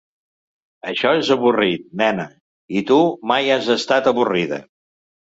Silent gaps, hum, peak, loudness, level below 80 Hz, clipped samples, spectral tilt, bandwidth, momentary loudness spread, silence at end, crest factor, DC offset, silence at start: 2.41-2.68 s; none; -2 dBFS; -18 LUFS; -62 dBFS; under 0.1%; -5 dB/octave; 8 kHz; 10 LU; 0.7 s; 16 dB; under 0.1%; 0.85 s